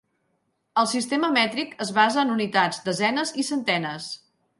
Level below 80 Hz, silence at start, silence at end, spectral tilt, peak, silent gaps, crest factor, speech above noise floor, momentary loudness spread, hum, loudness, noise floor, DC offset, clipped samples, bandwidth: -72 dBFS; 0.75 s; 0.45 s; -3.5 dB/octave; -4 dBFS; none; 20 dB; 49 dB; 9 LU; none; -23 LUFS; -72 dBFS; under 0.1%; under 0.1%; 11.5 kHz